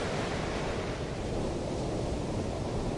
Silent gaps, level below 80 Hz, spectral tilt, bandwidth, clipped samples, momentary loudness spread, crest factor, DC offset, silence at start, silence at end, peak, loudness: none; -42 dBFS; -6 dB/octave; 11.5 kHz; under 0.1%; 2 LU; 12 dB; under 0.1%; 0 s; 0 s; -20 dBFS; -34 LUFS